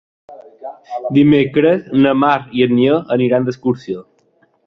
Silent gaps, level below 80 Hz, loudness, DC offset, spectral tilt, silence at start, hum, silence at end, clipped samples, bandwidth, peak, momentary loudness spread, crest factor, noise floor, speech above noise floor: none; -54 dBFS; -14 LUFS; under 0.1%; -8.5 dB/octave; 0.3 s; none; 0.65 s; under 0.1%; 6.2 kHz; 0 dBFS; 16 LU; 14 dB; -57 dBFS; 43 dB